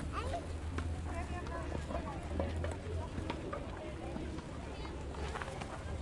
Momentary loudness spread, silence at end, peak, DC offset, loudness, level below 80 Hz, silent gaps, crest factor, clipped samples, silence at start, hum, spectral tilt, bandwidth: 5 LU; 0 s; -22 dBFS; under 0.1%; -42 LUFS; -46 dBFS; none; 18 dB; under 0.1%; 0 s; none; -6 dB/octave; 11.5 kHz